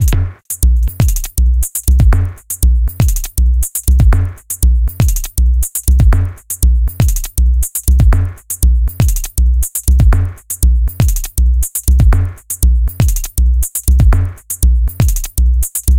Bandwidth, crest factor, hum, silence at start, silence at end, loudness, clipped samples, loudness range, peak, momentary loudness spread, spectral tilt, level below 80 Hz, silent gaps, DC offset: 17.5 kHz; 10 dB; none; 0 s; 0 s; -14 LUFS; under 0.1%; 1 LU; 0 dBFS; 5 LU; -5 dB/octave; -12 dBFS; none; under 0.1%